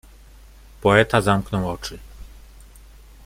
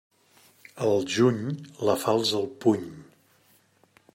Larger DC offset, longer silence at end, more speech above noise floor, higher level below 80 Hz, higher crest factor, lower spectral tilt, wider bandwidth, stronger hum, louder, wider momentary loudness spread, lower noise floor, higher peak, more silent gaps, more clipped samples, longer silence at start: neither; second, 0.95 s vs 1.1 s; second, 27 dB vs 38 dB; first, -42 dBFS vs -70 dBFS; about the same, 22 dB vs 18 dB; about the same, -5.5 dB/octave vs -5.5 dB/octave; about the same, 16 kHz vs 16 kHz; neither; first, -20 LUFS vs -26 LUFS; first, 17 LU vs 8 LU; second, -46 dBFS vs -63 dBFS; first, -2 dBFS vs -8 dBFS; neither; neither; about the same, 0.8 s vs 0.75 s